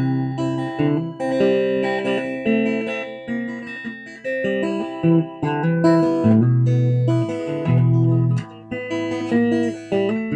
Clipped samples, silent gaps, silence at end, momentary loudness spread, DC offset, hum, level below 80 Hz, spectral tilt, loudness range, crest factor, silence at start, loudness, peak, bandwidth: under 0.1%; none; 0 s; 11 LU; under 0.1%; none; -58 dBFS; -8.5 dB/octave; 5 LU; 16 dB; 0 s; -20 LUFS; -4 dBFS; 9 kHz